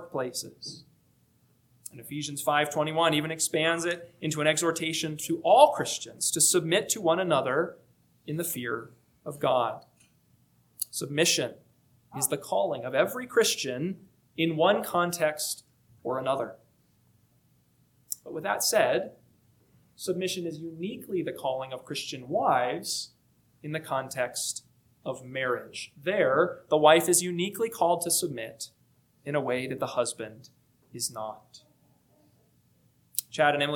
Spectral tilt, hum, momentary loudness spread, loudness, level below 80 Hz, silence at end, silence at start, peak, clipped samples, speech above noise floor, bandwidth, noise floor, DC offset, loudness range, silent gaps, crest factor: -3 dB/octave; 60 Hz at -65 dBFS; 17 LU; -28 LUFS; -74 dBFS; 0 s; 0 s; -2 dBFS; under 0.1%; 38 dB; 19 kHz; -66 dBFS; under 0.1%; 9 LU; none; 26 dB